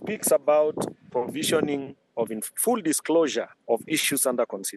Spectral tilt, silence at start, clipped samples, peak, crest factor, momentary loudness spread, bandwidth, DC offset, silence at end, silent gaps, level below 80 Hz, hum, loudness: -3 dB/octave; 0 s; under 0.1%; -10 dBFS; 16 dB; 9 LU; 13 kHz; under 0.1%; 0 s; none; -74 dBFS; none; -25 LUFS